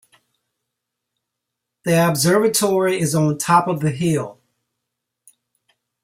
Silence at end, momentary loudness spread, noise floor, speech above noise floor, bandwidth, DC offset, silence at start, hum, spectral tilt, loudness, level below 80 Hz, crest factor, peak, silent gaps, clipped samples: 1.7 s; 7 LU; -81 dBFS; 64 dB; 16 kHz; under 0.1%; 1.85 s; none; -5 dB/octave; -18 LUFS; -60 dBFS; 18 dB; -4 dBFS; none; under 0.1%